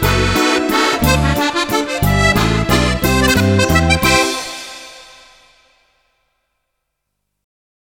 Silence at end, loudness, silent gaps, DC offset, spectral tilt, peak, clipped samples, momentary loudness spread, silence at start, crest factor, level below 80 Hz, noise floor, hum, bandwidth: 2.85 s; -14 LUFS; none; under 0.1%; -4.5 dB/octave; 0 dBFS; under 0.1%; 11 LU; 0 s; 16 dB; -26 dBFS; -73 dBFS; none; 17 kHz